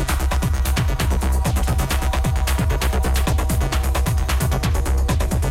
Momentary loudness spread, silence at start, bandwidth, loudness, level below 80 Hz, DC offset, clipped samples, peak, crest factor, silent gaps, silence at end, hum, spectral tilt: 1 LU; 0 s; 16.5 kHz; -21 LUFS; -20 dBFS; under 0.1%; under 0.1%; -8 dBFS; 10 dB; none; 0 s; none; -5 dB/octave